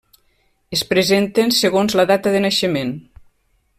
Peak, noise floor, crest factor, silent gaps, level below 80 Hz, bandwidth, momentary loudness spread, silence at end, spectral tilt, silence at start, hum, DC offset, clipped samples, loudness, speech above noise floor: -4 dBFS; -62 dBFS; 16 dB; none; -54 dBFS; 16 kHz; 8 LU; 0.8 s; -4 dB/octave; 0.7 s; none; under 0.1%; under 0.1%; -17 LUFS; 46 dB